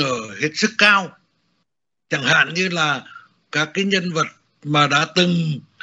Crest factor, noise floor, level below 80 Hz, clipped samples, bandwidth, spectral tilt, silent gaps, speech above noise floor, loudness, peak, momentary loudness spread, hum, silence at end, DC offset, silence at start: 20 dB; -76 dBFS; -64 dBFS; under 0.1%; 8 kHz; -2.5 dB/octave; none; 58 dB; -18 LUFS; 0 dBFS; 12 LU; none; 0.2 s; under 0.1%; 0 s